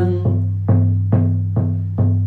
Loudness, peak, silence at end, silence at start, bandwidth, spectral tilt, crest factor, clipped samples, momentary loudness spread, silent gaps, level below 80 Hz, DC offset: -18 LUFS; -4 dBFS; 0 s; 0 s; 2.1 kHz; -12.5 dB/octave; 12 dB; under 0.1%; 4 LU; none; -46 dBFS; under 0.1%